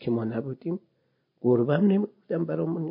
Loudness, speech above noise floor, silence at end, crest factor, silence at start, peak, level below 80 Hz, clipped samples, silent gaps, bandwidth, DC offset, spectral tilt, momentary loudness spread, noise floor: -27 LUFS; 40 dB; 0 s; 18 dB; 0 s; -10 dBFS; -70 dBFS; under 0.1%; none; 5.2 kHz; under 0.1%; -12.5 dB/octave; 11 LU; -66 dBFS